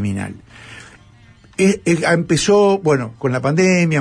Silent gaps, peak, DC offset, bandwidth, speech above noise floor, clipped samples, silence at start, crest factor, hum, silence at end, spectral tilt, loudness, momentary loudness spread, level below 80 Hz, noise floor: none; -4 dBFS; under 0.1%; 10.5 kHz; 31 dB; under 0.1%; 0 s; 14 dB; none; 0 s; -5.5 dB/octave; -16 LUFS; 17 LU; -50 dBFS; -46 dBFS